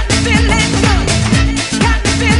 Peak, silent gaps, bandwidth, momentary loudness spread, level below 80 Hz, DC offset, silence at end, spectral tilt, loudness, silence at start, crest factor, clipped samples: 0 dBFS; none; 11.5 kHz; 2 LU; -18 dBFS; under 0.1%; 0 s; -4 dB/octave; -12 LUFS; 0 s; 12 dB; under 0.1%